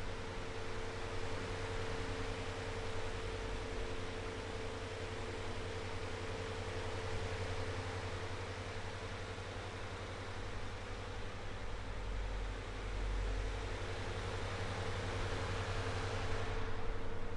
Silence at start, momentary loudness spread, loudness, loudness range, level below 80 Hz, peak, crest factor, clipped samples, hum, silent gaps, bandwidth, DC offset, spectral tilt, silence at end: 0 s; 5 LU; -43 LUFS; 4 LU; -46 dBFS; -24 dBFS; 16 dB; under 0.1%; none; none; 11.5 kHz; under 0.1%; -5 dB/octave; 0 s